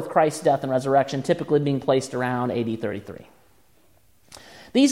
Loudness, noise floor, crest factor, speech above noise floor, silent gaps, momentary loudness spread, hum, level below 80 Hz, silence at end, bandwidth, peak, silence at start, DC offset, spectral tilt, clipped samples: -23 LUFS; -61 dBFS; 18 dB; 38 dB; none; 18 LU; none; -64 dBFS; 0 s; 15.5 kHz; -6 dBFS; 0 s; 0.1%; -5.5 dB/octave; under 0.1%